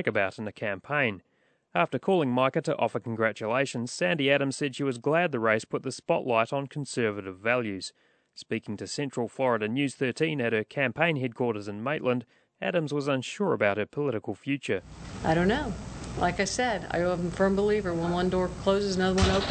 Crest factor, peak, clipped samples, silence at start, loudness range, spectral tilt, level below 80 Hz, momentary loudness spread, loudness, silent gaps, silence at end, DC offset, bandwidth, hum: 20 dB; -8 dBFS; under 0.1%; 0 s; 3 LU; -5.5 dB/octave; -48 dBFS; 8 LU; -28 LUFS; none; 0 s; under 0.1%; 9.2 kHz; none